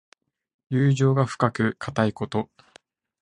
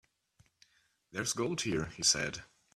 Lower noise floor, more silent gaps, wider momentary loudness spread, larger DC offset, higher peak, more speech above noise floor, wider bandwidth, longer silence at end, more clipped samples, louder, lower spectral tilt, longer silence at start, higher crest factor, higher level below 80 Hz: second, -57 dBFS vs -70 dBFS; neither; second, 9 LU vs 13 LU; neither; first, -4 dBFS vs -14 dBFS; about the same, 34 dB vs 36 dB; second, 10 kHz vs 15.5 kHz; first, 0.8 s vs 0.3 s; neither; first, -24 LUFS vs -32 LUFS; first, -7 dB/octave vs -2 dB/octave; second, 0.7 s vs 1.15 s; about the same, 22 dB vs 24 dB; about the same, -58 dBFS vs -62 dBFS